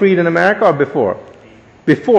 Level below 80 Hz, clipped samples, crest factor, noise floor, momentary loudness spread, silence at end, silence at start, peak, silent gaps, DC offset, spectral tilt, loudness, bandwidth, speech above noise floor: -56 dBFS; under 0.1%; 14 dB; -42 dBFS; 9 LU; 0 s; 0 s; 0 dBFS; none; under 0.1%; -7.5 dB/octave; -14 LUFS; 9.4 kHz; 30 dB